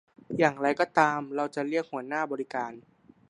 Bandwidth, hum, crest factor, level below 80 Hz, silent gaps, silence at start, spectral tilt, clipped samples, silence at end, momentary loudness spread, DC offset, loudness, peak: 11 kHz; none; 22 dB; -76 dBFS; none; 0.3 s; -5.5 dB/octave; under 0.1%; 0.5 s; 10 LU; under 0.1%; -28 LUFS; -6 dBFS